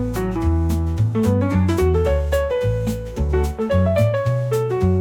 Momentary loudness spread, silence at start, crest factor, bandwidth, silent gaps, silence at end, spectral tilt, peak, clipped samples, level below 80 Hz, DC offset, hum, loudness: 4 LU; 0 s; 12 dB; 17.5 kHz; none; 0 s; -8 dB/octave; -6 dBFS; under 0.1%; -28 dBFS; under 0.1%; none; -20 LUFS